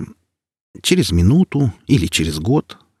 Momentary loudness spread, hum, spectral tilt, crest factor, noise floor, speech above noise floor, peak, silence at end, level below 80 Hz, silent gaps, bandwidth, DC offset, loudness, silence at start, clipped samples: 6 LU; none; -5.5 dB/octave; 16 dB; -60 dBFS; 44 dB; -2 dBFS; 0.4 s; -36 dBFS; 0.61-0.74 s; 15 kHz; under 0.1%; -17 LUFS; 0 s; under 0.1%